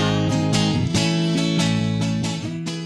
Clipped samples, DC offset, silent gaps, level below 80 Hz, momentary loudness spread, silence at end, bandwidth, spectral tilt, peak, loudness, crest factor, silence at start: under 0.1%; under 0.1%; none; -46 dBFS; 6 LU; 0 s; 12 kHz; -5 dB/octave; -6 dBFS; -21 LUFS; 14 dB; 0 s